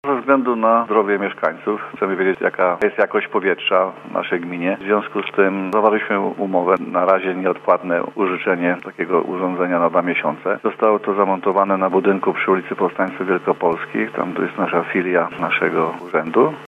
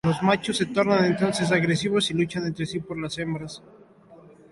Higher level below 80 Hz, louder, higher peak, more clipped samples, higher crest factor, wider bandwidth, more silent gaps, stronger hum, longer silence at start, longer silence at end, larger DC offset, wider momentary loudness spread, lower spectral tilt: second, -68 dBFS vs -56 dBFS; first, -19 LUFS vs -24 LUFS; first, 0 dBFS vs -8 dBFS; neither; about the same, 18 dB vs 18 dB; second, 5.8 kHz vs 11.5 kHz; neither; neither; about the same, 0.05 s vs 0.05 s; second, 0.05 s vs 0.35 s; neither; second, 6 LU vs 10 LU; first, -7.5 dB/octave vs -5.5 dB/octave